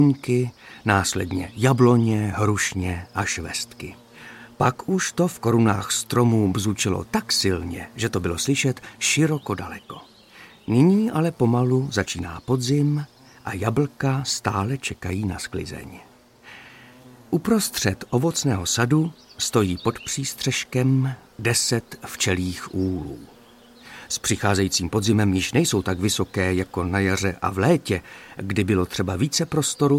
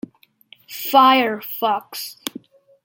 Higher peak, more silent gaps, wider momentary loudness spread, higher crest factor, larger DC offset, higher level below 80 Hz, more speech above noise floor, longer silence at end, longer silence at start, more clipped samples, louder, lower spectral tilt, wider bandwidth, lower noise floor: about the same, -2 dBFS vs -2 dBFS; neither; second, 13 LU vs 19 LU; about the same, 20 dB vs 20 dB; neither; first, -50 dBFS vs -72 dBFS; second, 27 dB vs 34 dB; second, 0 s vs 0.55 s; second, 0 s vs 0.7 s; neither; second, -23 LUFS vs -18 LUFS; first, -4.5 dB/octave vs -2.5 dB/octave; about the same, 16.5 kHz vs 17 kHz; about the same, -49 dBFS vs -52 dBFS